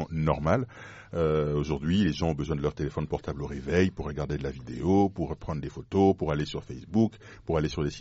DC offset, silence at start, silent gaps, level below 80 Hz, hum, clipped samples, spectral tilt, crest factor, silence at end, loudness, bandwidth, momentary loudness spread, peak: under 0.1%; 0 s; none; -44 dBFS; none; under 0.1%; -6.5 dB/octave; 18 dB; 0 s; -29 LUFS; 8 kHz; 11 LU; -10 dBFS